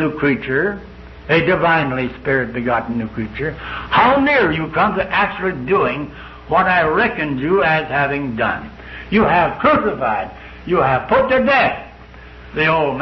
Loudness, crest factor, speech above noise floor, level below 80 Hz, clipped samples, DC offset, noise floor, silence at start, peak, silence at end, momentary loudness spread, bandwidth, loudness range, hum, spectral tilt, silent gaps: -16 LUFS; 16 dB; 22 dB; -40 dBFS; under 0.1%; under 0.1%; -38 dBFS; 0 s; -2 dBFS; 0 s; 13 LU; 6.2 kHz; 2 LU; none; -8 dB/octave; none